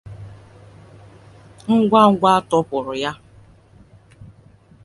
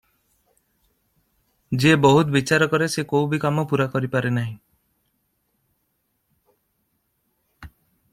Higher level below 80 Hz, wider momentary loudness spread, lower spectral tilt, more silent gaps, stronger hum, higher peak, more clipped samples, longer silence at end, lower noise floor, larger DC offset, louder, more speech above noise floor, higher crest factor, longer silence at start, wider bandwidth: about the same, -54 dBFS vs -56 dBFS; first, 26 LU vs 11 LU; about the same, -6.5 dB/octave vs -6 dB/octave; neither; neither; about the same, 0 dBFS vs -2 dBFS; neither; first, 0.6 s vs 0.45 s; second, -49 dBFS vs -72 dBFS; neither; first, -17 LUFS vs -20 LUFS; second, 33 dB vs 53 dB; about the same, 20 dB vs 22 dB; second, 0.05 s vs 1.7 s; second, 11.5 kHz vs 15.5 kHz